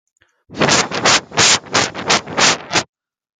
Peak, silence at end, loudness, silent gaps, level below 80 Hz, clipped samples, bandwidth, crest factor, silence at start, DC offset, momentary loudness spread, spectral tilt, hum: 0 dBFS; 0.55 s; -14 LUFS; none; -50 dBFS; under 0.1%; 14.5 kHz; 18 dB; 0.5 s; under 0.1%; 7 LU; -1.5 dB/octave; none